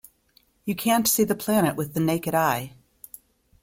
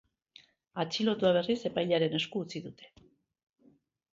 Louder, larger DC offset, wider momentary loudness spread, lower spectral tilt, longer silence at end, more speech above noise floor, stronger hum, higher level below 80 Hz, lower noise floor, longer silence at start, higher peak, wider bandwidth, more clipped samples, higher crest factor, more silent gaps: first, -23 LUFS vs -31 LUFS; neither; first, 22 LU vs 15 LU; about the same, -4.5 dB/octave vs -5.5 dB/octave; second, 0.95 s vs 1.25 s; first, 40 dB vs 35 dB; neither; first, -58 dBFS vs -72 dBFS; about the same, -63 dBFS vs -66 dBFS; about the same, 0.65 s vs 0.75 s; first, -8 dBFS vs -14 dBFS; first, 16.5 kHz vs 7.8 kHz; neither; about the same, 18 dB vs 20 dB; neither